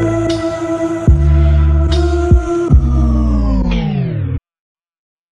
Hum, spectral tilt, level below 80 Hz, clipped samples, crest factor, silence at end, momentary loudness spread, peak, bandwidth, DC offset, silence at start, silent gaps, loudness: none; -8 dB/octave; -16 dBFS; under 0.1%; 12 dB; 0.95 s; 7 LU; 0 dBFS; 8 kHz; under 0.1%; 0 s; none; -14 LUFS